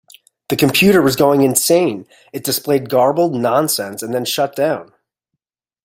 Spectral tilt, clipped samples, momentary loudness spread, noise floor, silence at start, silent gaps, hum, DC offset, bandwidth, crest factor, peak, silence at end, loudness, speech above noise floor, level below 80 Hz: -4 dB/octave; under 0.1%; 11 LU; -79 dBFS; 0.5 s; none; none; under 0.1%; 16.5 kHz; 16 dB; 0 dBFS; 1 s; -15 LUFS; 64 dB; -54 dBFS